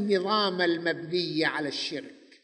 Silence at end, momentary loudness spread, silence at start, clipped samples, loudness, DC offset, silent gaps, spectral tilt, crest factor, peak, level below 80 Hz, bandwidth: 0.3 s; 8 LU; 0 s; under 0.1%; -27 LUFS; under 0.1%; none; -4.5 dB/octave; 16 dB; -12 dBFS; -80 dBFS; 10 kHz